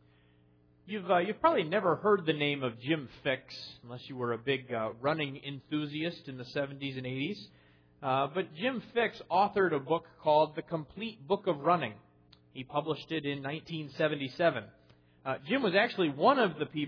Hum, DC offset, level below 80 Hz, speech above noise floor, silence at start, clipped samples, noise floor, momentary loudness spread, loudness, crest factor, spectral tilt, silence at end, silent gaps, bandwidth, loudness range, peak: none; under 0.1%; -70 dBFS; 33 dB; 0.85 s; under 0.1%; -65 dBFS; 13 LU; -32 LUFS; 20 dB; -7.5 dB/octave; 0 s; none; 5.4 kHz; 5 LU; -12 dBFS